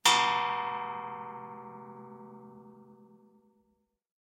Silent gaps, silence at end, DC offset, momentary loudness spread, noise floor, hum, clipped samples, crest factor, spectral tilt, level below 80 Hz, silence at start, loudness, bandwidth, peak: none; 1.4 s; under 0.1%; 25 LU; -76 dBFS; none; under 0.1%; 26 dB; -0.5 dB/octave; -84 dBFS; 0.05 s; -31 LUFS; 16 kHz; -8 dBFS